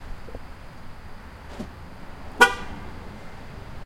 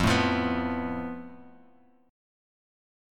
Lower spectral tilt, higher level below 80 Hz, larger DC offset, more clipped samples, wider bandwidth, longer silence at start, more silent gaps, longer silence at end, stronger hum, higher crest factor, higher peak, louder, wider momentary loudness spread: second, -3 dB/octave vs -5.5 dB/octave; first, -42 dBFS vs -48 dBFS; neither; neither; about the same, 16.5 kHz vs 17 kHz; about the same, 0 s vs 0 s; neither; second, 0 s vs 1 s; neither; first, 28 dB vs 20 dB; first, 0 dBFS vs -10 dBFS; first, -20 LUFS vs -28 LUFS; first, 25 LU vs 17 LU